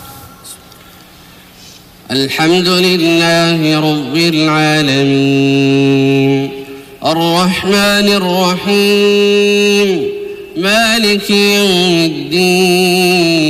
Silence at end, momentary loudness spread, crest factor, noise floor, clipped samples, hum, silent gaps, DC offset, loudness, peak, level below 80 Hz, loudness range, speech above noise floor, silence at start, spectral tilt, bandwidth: 0 s; 8 LU; 8 dB; -38 dBFS; under 0.1%; none; none; under 0.1%; -10 LUFS; -4 dBFS; -48 dBFS; 2 LU; 28 dB; 0 s; -4.5 dB/octave; 15.5 kHz